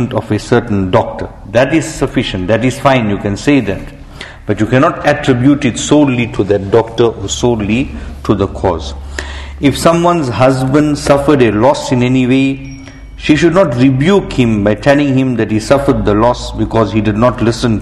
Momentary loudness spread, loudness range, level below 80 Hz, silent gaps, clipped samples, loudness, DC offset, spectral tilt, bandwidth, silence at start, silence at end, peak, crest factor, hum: 11 LU; 3 LU; -30 dBFS; none; 0.4%; -12 LUFS; under 0.1%; -6 dB/octave; 12.5 kHz; 0 s; 0 s; 0 dBFS; 12 dB; none